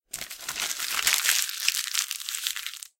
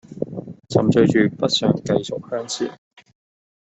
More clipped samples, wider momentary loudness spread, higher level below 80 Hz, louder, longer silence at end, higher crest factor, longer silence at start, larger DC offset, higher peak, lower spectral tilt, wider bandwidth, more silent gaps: neither; second, 11 LU vs 14 LU; second, -66 dBFS vs -56 dBFS; second, -26 LUFS vs -20 LUFS; second, 0.2 s vs 0.95 s; first, 28 dB vs 18 dB; about the same, 0.15 s vs 0.1 s; neither; about the same, 0 dBFS vs -2 dBFS; second, 3.5 dB/octave vs -5.5 dB/octave; first, 17 kHz vs 8.4 kHz; neither